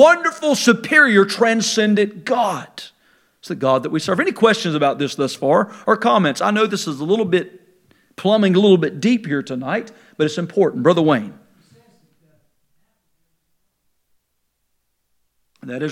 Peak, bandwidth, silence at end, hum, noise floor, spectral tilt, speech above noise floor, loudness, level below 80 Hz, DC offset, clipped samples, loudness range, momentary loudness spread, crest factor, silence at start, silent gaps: 0 dBFS; 15.5 kHz; 0 s; none; -70 dBFS; -5 dB/octave; 54 dB; -17 LUFS; -70 dBFS; under 0.1%; under 0.1%; 5 LU; 11 LU; 18 dB; 0 s; none